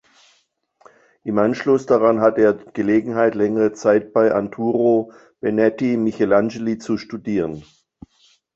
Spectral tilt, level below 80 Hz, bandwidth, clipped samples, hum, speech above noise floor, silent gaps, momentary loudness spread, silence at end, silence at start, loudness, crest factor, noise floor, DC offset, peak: -7.5 dB/octave; -56 dBFS; 7.8 kHz; under 0.1%; none; 46 dB; none; 9 LU; 0.95 s; 1.25 s; -19 LUFS; 18 dB; -64 dBFS; under 0.1%; -2 dBFS